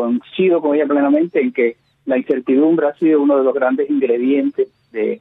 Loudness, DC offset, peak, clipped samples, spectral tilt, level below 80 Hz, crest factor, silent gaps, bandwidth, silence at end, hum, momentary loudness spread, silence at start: -16 LUFS; under 0.1%; -4 dBFS; under 0.1%; -9.5 dB/octave; -70 dBFS; 12 dB; none; 4 kHz; 0.05 s; none; 7 LU; 0 s